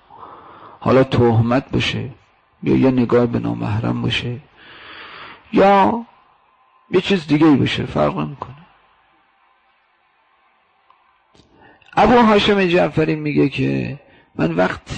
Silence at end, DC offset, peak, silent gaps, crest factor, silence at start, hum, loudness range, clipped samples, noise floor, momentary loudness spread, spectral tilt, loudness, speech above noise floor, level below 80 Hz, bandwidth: 0 s; under 0.1%; -6 dBFS; none; 12 dB; 0.2 s; none; 4 LU; under 0.1%; -60 dBFS; 21 LU; -7 dB/octave; -17 LUFS; 44 dB; -44 dBFS; 9 kHz